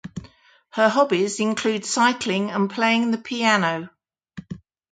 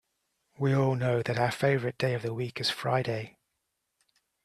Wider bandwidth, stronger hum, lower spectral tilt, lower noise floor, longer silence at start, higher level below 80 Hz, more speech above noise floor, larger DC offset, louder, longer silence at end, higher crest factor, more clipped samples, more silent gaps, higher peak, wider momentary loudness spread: second, 9.4 kHz vs 13.5 kHz; neither; second, -4 dB/octave vs -6 dB/octave; second, -52 dBFS vs -81 dBFS; second, 0.05 s vs 0.6 s; first, -60 dBFS vs -66 dBFS; second, 31 dB vs 53 dB; neither; first, -21 LUFS vs -29 LUFS; second, 0.35 s vs 1.15 s; about the same, 20 dB vs 18 dB; neither; neither; first, -4 dBFS vs -12 dBFS; first, 19 LU vs 8 LU